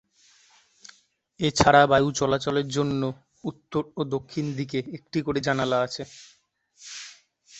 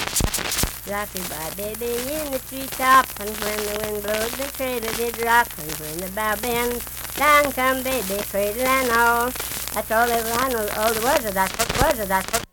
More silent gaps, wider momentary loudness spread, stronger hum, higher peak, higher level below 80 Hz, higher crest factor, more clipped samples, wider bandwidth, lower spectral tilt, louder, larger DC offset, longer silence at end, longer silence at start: neither; first, 21 LU vs 11 LU; neither; about the same, -2 dBFS vs 0 dBFS; second, -52 dBFS vs -40 dBFS; about the same, 24 dB vs 22 dB; neither; second, 8.4 kHz vs 19.5 kHz; first, -5 dB/octave vs -2.5 dB/octave; about the same, -24 LUFS vs -22 LUFS; neither; about the same, 0 s vs 0.05 s; first, 1.4 s vs 0 s